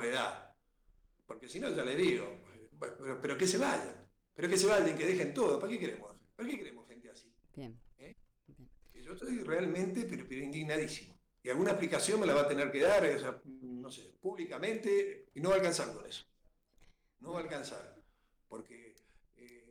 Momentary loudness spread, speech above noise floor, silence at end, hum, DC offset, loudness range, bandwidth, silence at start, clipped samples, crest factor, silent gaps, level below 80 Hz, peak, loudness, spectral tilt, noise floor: 21 LU; 37 dB; 0.1 s; none; under 0.1%; 14 LU; 20 kHz; 0 s; under 0.1%; 14 dB; none; -68 dBFS; -22 dBFS; -35 LUFS; -4 dB/octave; -71 dBFS